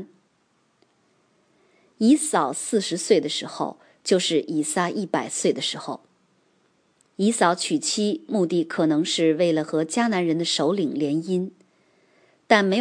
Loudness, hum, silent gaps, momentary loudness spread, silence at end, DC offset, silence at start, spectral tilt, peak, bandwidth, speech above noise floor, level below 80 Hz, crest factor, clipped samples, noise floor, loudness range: -23 LUFS; none; none; 8 LU; 0 s; under 0.1%; 0 s; -4 dB/octave; -2 dBFS; 10.5 kHz; 44 dB; -76 dBFS; 22 dB; under 0.1%; -66 dBFS; 3 LU